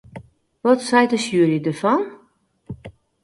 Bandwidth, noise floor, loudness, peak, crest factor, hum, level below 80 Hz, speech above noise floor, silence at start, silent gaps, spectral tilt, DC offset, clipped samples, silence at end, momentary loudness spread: 11.5 kHz; -59 dBFS; -19 LUFS; -2 dBFS; 20 dB; none; -56 dBFS; 42 dB; 0.15 s; none; -5.5 dB/octave; under 0.1%; under 0.1%; 0.35 s; 21 LU